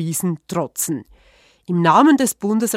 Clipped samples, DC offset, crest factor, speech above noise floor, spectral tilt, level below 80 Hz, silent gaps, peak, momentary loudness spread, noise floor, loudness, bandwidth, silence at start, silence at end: under 0.1%; under 0.1%; 18 dB; 36 dB; -5 dB/octave; -58 dBFS; none; 0 dBFS; 12 LU; -53 dBFS; -18 LUFS; 16 kHz; 0 s; 0 s